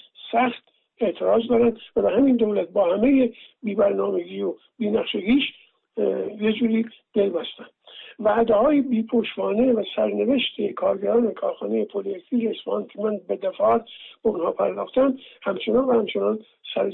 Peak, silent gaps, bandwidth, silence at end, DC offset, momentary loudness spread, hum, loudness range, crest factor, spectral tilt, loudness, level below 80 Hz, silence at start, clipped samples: -10 dBFS; none; 4.1 kHz; 0 s; under 0.1%; 10 LU; none; 4 LU; 12 dB; -9.5 dB/octave; -23 LUFS; -58 dBFS; 0.2 s; under 0.1%